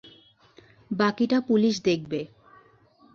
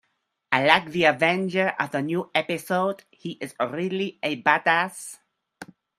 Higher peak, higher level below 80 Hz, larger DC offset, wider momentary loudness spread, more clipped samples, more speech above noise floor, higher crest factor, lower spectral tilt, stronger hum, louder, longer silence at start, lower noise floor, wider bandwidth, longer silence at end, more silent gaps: second, -10 dBFS vs 0 dBFS; about the same, -66 dBFS vs -70 dBFS; neither; second, 12 LU vs 15 LU; neither; second, 34 dB vs 51 dB; second, 18 dB vs 24 dB; about the same, -5.5 dB/octave vs -4.5 dB/octave; neither; about the same, -25 LUFS vs -23 LUFS; second, 0.05 s vs 0.5 s; second, -58 dBFS vs -75 dBFS; second, 7.2 kHz vs 15 kHz; first, 0.9 s vs 0.35 s; neither